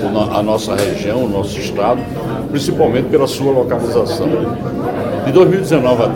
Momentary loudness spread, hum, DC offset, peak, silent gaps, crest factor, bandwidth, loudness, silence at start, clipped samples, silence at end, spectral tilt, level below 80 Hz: 8 LU; none; under 0.1%; 0 dBFS; none; 14 dB; 17 kHz; -15 LUFS; 0 s; under 0.1%; 0 s; -6.5 dB/octave; -40 dBFS